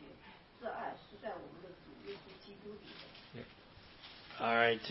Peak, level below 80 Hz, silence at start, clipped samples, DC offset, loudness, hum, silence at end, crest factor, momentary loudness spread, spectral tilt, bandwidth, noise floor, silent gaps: -16 dBFS; -70 dBFS; 0 s; under 0.1%; under 0.1%; -39 LUFS; none; 0 s; 26 dB; 23 LU; -1.5 dB/octave; 5.8 kHz; -59 dBFS; none